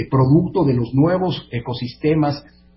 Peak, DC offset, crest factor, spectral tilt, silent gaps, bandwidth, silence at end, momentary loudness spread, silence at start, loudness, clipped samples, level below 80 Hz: -4 dBFS; under 0.1%; 14 dB; -12.5 dB/octave; none; 5.8 kHz; 0.35 s; 11 LU; 0 s; -18 LUFS; under 0.1%; -44 dBFS